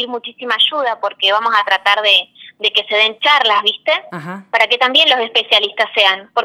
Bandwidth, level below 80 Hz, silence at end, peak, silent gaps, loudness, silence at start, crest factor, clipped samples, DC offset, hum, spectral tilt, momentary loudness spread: 17 kHz; -72 dBFS; 0 s; 0 dBFS; none; -13 LUFS; 0 s; 16 dB; under 0.1%; under 0.1%; none; -2 dB/octave; 9 LU